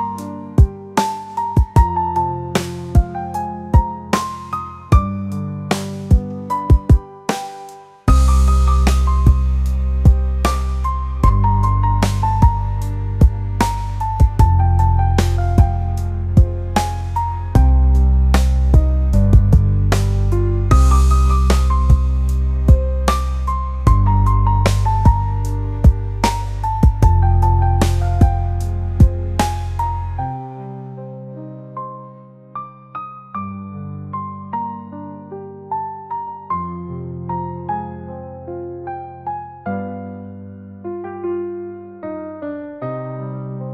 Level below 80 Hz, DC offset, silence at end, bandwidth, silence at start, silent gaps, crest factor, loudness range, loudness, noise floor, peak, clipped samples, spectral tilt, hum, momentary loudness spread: -18 dBFS; under 0.1%; 0 s; 13.5 kHz; 0 s; none; 16 dB; 13 LU; -17 LUFS; -40 dBFS; 0 dBFS; under 0.1%; -7 dB/octave; none; 16 LU